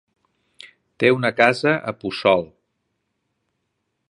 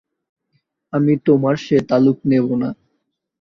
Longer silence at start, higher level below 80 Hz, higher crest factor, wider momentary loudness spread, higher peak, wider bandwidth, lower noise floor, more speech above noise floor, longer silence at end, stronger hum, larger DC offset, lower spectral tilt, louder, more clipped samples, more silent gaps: about the same, 1 s vs 0.95 s; second, -62 dBFS vs -56 dBFS; first, 22 dB vs 16 dB; about the same, 8 LU vs 10 LU; about the same, 0 dBFS vs -2 dBFS; first, 11.5 kHz vs 7.2 kHz; about the same, -75 dBFS vs -72 dBFS; about the same, 56 dB vs 56 dB; first, 1.65 s vs 0.7 s; neither; neither; second, -6 dB/octave vs -8.5 dB/octave; about the same, -19 LUFS vs -17 LUFS; neither; neither